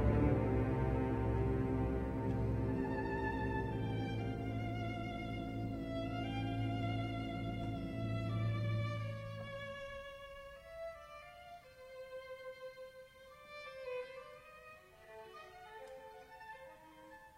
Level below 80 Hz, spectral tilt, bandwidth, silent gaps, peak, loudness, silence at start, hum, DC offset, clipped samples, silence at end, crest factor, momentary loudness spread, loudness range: -48 dBFS; -8 dB/octave; 9 kHz; none; -20 dBFS; -40 LUFS; 0 s; none; under 0.1%; under 0.1%; 0 s; 20 dB; 19 LU; 14 LU